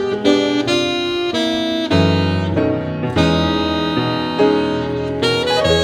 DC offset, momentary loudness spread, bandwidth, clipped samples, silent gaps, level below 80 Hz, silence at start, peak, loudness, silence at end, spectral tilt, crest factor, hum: under 0.1%; 4 LU; 14 kHz; under 0.1%; none; -38 dBFS; 0 s; 0 dBFS; -17 LUFS; 0 s; -5.5 dB/octave; 16 dB; none